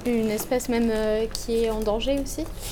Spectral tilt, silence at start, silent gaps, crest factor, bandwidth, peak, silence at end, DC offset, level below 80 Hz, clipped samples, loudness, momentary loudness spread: -4.5 dB/octave; 0 s; none; 16 dB; over 20 kHz; -8 dBFS; 0 s; under 0.1%; -36 dBFS; under 0.1%; -25 LUFS; 4 LU